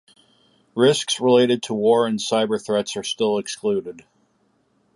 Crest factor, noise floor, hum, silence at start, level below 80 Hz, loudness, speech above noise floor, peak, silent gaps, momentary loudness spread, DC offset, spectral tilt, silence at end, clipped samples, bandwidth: 18 dB; -65 dBFS; none; 0.75 s; -68 dBFS; -20 LUFS; 45 dB; -4 dBFS; none; 9 LU; under 0.1%; -4 dB/octave; 0.95 s; under 0.1%; 11.5 kHz